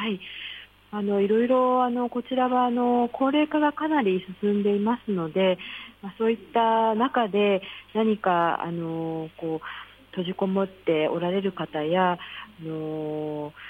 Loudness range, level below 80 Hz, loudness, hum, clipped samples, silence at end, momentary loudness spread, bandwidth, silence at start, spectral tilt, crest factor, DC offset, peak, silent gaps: 4 LU; -64 dBFS; -25 LUFS; none; under 0.1%; 0 s; 13 LU; 4.8 kHz; 0 s; -8.5 dB/octave; 14 dB; under 0.1%; -10 dBFS; none